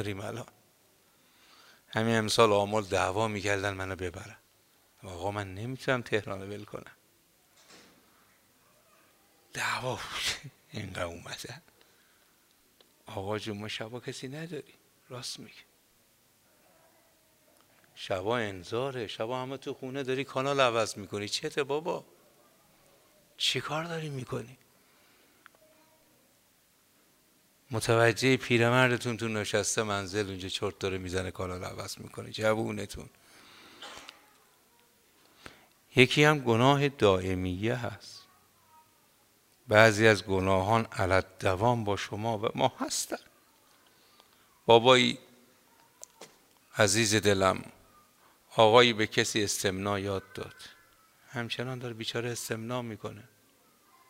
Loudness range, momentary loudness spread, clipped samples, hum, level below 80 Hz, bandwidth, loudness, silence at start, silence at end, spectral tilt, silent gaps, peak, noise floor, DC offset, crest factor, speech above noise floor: 14 LU; 20 LU; under 0.1%; none; -66 dBFS; 16 kHz; -29 LUFS; 0 s; 0.9 s; -4 dB/octave; none; -4 dBFS; -66 dBFS; under 0.1%; 28 dB; 37 dB